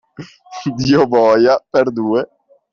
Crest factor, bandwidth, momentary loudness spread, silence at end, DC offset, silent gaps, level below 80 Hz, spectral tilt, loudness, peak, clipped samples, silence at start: 12 dB; 7.2 kHz; 14 LU; 0.5 s; under 0.1%; none; -52 dBFS; -6.5 dB/octave; -14 LUFS; -2 dBFS; under 0.1%; 0.2 s